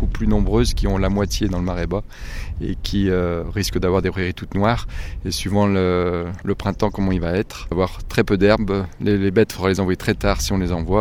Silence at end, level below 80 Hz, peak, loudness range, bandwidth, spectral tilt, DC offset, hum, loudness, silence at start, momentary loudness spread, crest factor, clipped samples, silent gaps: 0 s; -28 dBFS; 0 dBFS; 3 LU; 16 kHz; -6 dB/octave; under 0.1%; none; -21 LUFS; 0 s; 8 LU; 20 dB; under 0.1%; none